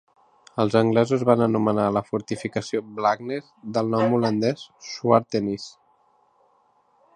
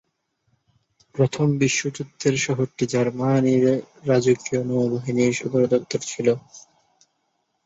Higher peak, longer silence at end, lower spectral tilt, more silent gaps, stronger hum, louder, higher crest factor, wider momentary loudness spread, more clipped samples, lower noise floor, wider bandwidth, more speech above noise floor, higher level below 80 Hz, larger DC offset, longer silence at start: first, -2 dBFS vs -6 dBFS; first, 1.45 s vs 1.05 s; about the same, -6.5 dB/octave vs -5.5 dB/octave; neither; neither; about the same, -23 LUFS vs -22 LUFS; about the same, 22 dB vs 18 dB; first, 13 LU vs 5 LU; neither; second, -63 dBFS vs -72 dBFS; first, 10 kHz vs 8 kHz; second, 40 dB vs 51 dB; about the same, -62 dBFS vs -60 dBFS; neither; second, 0.55 s vs 1.15 s